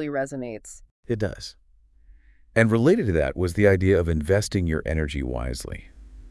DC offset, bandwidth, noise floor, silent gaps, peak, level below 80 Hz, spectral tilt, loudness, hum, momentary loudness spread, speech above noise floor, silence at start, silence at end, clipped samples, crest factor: under 0.1%; 12 kHz; -55 dBFS; 0.91-1.03 s; -4 dBFS; -38 dBFS; -6.5 dB/octave; -23 LUFS; none; 19 LU; 33 dB; 0 s; 0 s; under 0.1%; 20 dB